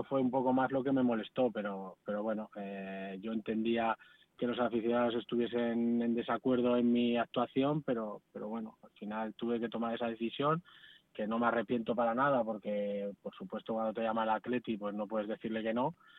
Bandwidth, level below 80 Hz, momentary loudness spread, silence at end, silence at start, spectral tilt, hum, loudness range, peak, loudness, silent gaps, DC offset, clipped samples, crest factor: 4.1 kHz; -74 dBFS; 11 LU; 0 s; 0 s; -9 dB/octave; none; 5 LU; -16 dBFS; -35 LUFS; none; under 0.1%; under 0.1%; 18 dB